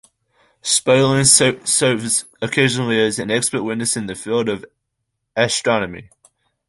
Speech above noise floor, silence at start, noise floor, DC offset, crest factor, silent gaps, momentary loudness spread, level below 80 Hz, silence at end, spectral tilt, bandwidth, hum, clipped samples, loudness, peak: 58 dB; 0.65 s; -75 dBFS; under 0.1%; 20 dB; none; 12 LU; -54 dBFS; 0.65 s; -3 dB/octave; 12 kHz; none; under 0.1%; -17 LUFS; 0 dBFS